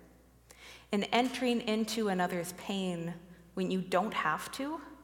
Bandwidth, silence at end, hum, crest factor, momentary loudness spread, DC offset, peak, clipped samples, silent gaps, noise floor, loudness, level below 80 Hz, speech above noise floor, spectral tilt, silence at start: 17.5 kHz; 0 s; none; 24 dB; 14 LU; under 0.1%; -10 dBFS; under 0.1%; none; -60 dBFS; -33 LUFS; -66 dBFS; 27 dB; -4.5 dB/octave; 0 s